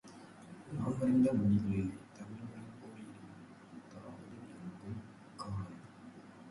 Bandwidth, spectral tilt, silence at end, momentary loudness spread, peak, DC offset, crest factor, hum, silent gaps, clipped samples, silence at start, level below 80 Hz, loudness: 11.5 kHz; -8.5 dB/octave; 0 s; 24 LU; -20 dBFS; under 0.1%; 18 dB; none; none; under 0.1%; 0.05 s; -62 dBFS; -36 LUFS